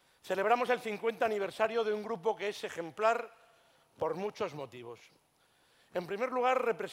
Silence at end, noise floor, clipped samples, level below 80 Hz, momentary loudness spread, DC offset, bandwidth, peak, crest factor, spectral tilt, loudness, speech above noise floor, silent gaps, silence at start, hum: 0 s; -70 dBFS; under 0.1%; -80 dBFS; 13 LU; under 0.1%; 16 kHz; -14 dBFS; 20 dB; -4.5 dB/octave; -33 LUFS; 36 dB; none; 0.25 s; none